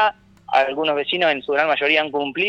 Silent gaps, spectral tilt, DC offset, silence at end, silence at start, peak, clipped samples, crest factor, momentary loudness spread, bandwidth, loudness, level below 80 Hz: none; -4.5 dB/octave; under 0.1%; 0 s; 0 s; -2 dBFS; under 0.1%; 18 dB; 4 LU; 8 kHz; -19 LUFS; -62 dBFS